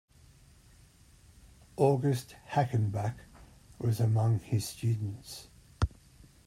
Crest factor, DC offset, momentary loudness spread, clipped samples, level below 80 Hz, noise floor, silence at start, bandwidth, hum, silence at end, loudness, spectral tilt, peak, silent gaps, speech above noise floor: 20 dB; under 0.1%; 16 LU; under 0.1%; -50 dBFS; -59 dBFS; 1.8 s; 15 kHz; none; 0.6 s; -31 LUFS; -7 dB/octave; -12 dBFS; none; 29 dB